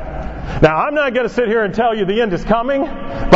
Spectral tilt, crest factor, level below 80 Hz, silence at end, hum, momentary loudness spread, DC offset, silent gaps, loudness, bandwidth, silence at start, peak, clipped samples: -7 dB/octave; 16 dB; -28 dBFS; 0 s; none; 11 LU; under 0.1%; none; -16 LUFS; 7.8 kHz; 0 s; 0 dBFS; 0.2%